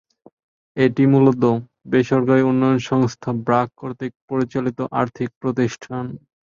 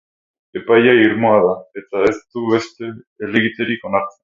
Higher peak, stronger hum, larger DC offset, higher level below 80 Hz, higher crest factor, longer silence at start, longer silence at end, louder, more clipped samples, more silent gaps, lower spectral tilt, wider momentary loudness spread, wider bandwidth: about the same, -2 dBFS vs 0 dBFS; neither; neither; about the same, -56 dBFS vs -56 dBFS; about the same, 16 dB vs 16 dB; first, 0.75 s vs 0.55 s; first, 0.35 s vs 0.15 s; second, -19 LUFS vs -16 LUFS; neither; first, 4.15-4.28 s, 5.36-5.41 s vs 3.07-3.16 s; first, -8 dB/octave vs -6.5 dB/octave; second, 14 LU vs 17 LU; about the same, 7.4 kHz vs 7.6 kHz